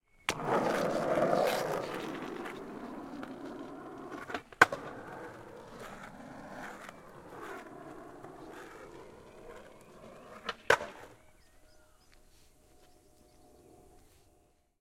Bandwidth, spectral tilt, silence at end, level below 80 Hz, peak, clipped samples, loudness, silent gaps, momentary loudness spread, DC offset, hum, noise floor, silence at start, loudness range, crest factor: 16.5 kHz; -4 dB/octave; 0.85 s; -64 dBFS; -4 dBFS; under 0.1%; -34 LUFS; none; 22 LU; under 0.1%; none; -68 dBFS; 0.3 s; 14 LU; 34 dB